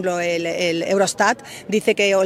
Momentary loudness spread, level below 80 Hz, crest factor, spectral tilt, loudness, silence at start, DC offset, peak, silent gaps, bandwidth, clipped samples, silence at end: 5 LU; -62 dBFS; 18 dB; -3.5 dB/octave; -20 LUFS; 0 s; under 0.1%; -2 dBFS; none; 16 kHz; under 0.1%; 0 s